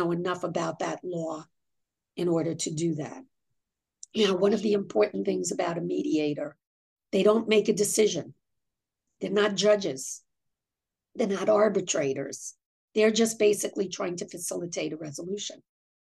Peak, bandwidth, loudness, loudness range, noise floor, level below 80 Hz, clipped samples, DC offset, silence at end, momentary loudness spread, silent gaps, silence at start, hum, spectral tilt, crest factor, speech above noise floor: -10 dBFS; 12.5 kHz; -27 LUFS; 5 LU; -90 dBFS; -74 dBFS; under 0.1%; under 0.1%; 0.5 s; 14 LU; 6.67-6.96 s, 12.66-12.88 s; 0 s; none; -4 dB/octave; 18 dB; 63 dB